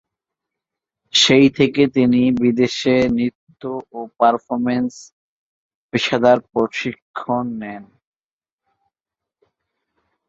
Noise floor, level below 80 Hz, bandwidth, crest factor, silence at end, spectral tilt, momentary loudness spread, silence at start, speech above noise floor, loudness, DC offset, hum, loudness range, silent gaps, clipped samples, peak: under -90 dBFS; -56 dBFS; 7.8 kHz; 18 dB; 2.45 s; -4.5 dB/octave; 16 LU; 1.15 s; over 73 dB; -17 LUFS; under 0.1%; none; 11 LU; 3.35-3.47 s, 5.12-5.89 s, 7.02-7.14 s; under 0.1%; -2 dBFS